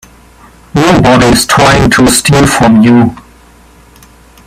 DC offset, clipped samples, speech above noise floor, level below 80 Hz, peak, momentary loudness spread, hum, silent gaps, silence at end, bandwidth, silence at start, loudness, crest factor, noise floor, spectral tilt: under 0.1%; 0.3%; 33 dB; -28 dBFS; 0 dBFS; 4 LU; none; none; 1.3 s; 16.5 kHz; 0.75 s; -6 LUFS; 8 dB; -38 dBFS; -4.5 dB/octave